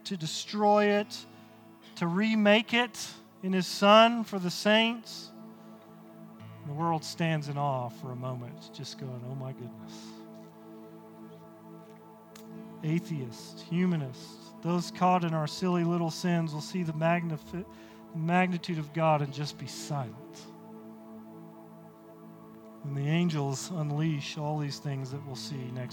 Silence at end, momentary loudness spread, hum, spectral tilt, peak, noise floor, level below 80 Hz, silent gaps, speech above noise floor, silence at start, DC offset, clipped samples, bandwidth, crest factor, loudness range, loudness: 0 s; 25 LU; none; -5.5 dB/octave; -8 dBFS; -53 dBFS; -74 dBFS; none; 24 dB; 0.05 s; under 0.1%; under 0.1%; 19 kHz; 24 dB; 16 LU; -29 LUFS